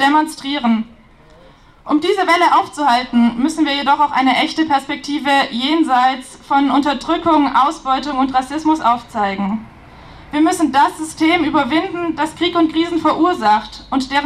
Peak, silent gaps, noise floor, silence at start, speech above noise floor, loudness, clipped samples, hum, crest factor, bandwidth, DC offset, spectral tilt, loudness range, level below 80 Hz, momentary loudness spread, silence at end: 0 dBFS; none; -45 dBFS; 0 s; 29 dB; -16 LUFS; under 0.1%; none; 16 dB; 13 kHz; under 0.1%; -4 dB/octave; 2 LU; -48 dBFS; 7 LU; 0 s